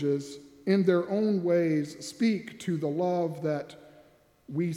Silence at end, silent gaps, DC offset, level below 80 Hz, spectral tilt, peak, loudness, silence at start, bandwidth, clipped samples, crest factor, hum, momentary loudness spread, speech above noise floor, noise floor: 0 s; none; under 0.1%; -74 dBFS; -7 dB/octave; -10 dBFS; -29 LUFS; 0 s; 14 kHz; under 0.1%; 18 dB; none; 12 LU; 32 dB; -60 dBFS